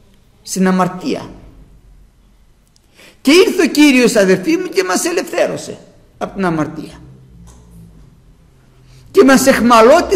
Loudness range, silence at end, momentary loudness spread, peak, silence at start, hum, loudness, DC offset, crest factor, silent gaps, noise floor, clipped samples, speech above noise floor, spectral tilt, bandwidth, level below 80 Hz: 10 LU; 0 s; 18 LU; 0 dBFS; 0.45 s; none; -12 LUFS; under 0.1%; 14 dB; none; -50 dBFS; under 0.1%; 38 dB; -4.5 dB/octave; 16 kHz; -44 dBFS